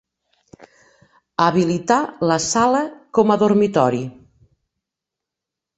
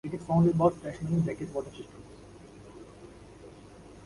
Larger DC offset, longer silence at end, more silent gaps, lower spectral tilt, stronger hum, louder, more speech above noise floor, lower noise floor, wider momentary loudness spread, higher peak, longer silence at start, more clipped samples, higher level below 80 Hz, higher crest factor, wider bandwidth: neither; first, 1.65 s vs 0 s; neither; second, -5 dB/octave vs -9 dB/octave; neither; first, -18 LUFS vs -28 LUFS; first, 68 dB vs 22 dB; first, -85 dBFS vs -50 dBFS; second, 6 LU vs 25 LU; first, 0 dBFS vs -12 dBFS; first, 0.6 s vs 0.05 s; neither; about the same, -58 dBFS vs -56 dBFS; about the same, 20 dB vs 20 dB; second, 8.2 kHz vs 11.5 kHz